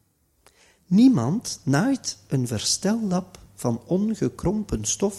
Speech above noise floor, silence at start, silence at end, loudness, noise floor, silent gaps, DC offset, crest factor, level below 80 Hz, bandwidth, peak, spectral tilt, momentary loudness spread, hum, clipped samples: 38 dB; 0.9 s; 0 s; -23 LUFS; -61 dBFS; none; under 0.1%; 18 dB; -46 dBFS; 14 kHz; -6 dBFS; -5 dB/octave; 10 LU; none; under 0.1%